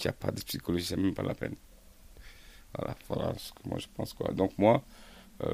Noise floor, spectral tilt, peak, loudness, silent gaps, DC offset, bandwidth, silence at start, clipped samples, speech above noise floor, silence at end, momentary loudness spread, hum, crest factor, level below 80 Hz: -54 dBFS; -6 dB/octave; -10 dBFS; -33 LUFS; none; under 0.1%; 15.5 kHz; 0 s; under 0.1%; 22 dB; 0 s; 24 LU; none; 24 dB; -54 dBFS